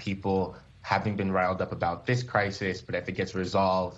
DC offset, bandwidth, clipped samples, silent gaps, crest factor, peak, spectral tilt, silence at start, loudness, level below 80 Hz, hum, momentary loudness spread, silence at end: under 0.1%; 8 kHz; under 0.1%; none; 20 dB; -8 dBFS; -6.5 dB/octave; 0 s; -29 LUFS; -56 dBFS; none; 6 LU; 0 s